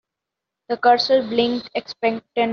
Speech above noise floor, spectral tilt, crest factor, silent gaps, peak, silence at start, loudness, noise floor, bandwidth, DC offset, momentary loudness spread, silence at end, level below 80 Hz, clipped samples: 65 dB; -1.5 dB/octave; 18 dB; none; -2 dBFS; 0.7 s; -20 LUFS; -84 dBFS; 6.8 kHz; under 0.1%; 11 LU; 0 s; -64 dBFS; under 0.1%